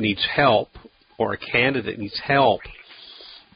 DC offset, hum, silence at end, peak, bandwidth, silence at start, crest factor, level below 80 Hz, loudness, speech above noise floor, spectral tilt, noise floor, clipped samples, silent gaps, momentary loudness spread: under 0.1%; none; 0.2 s; -4 dBFS; 5.4 kHz; 0 s; 20 dB; -52 dBFS; -21 LUFS; 23 dB; -10 dB/octave; -44 dBFS; under 0.1%; none; 22 LU